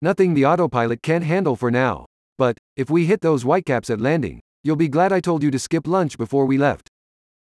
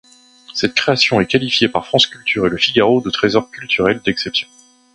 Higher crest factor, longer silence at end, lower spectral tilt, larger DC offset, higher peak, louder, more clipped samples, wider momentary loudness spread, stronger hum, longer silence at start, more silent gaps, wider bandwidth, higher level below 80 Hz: about the same, 14 dB vs 16 dB; first, 0.65 s vs 0.5 s; first, -7 dB/octave vs -4.5 dB/octave; neither; second, -4 dBFS vs 0 dBFS; second, -20 LUFS vs -15 LUFS; neither; about the same, 6 LU vs 7 LU; neither; second, 0 s vs 0.5 s; first, 2.06-2.36 s, 2.58-2.76 s, 4.41-4.64 s vs none; about the same, 12 kHz vs 11 kHz; second, -54 dBFS vs -48 dBFS